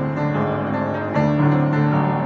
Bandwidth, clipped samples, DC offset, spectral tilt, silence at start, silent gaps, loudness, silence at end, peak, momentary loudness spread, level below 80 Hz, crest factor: 6.4 kHz; under 0.1%; under 0.1%; -9.5 dB/octave; 0 s; none; -20 LUFS; 0 s; -6 dBFS; 5 LU; -50 dBFS; 12 dB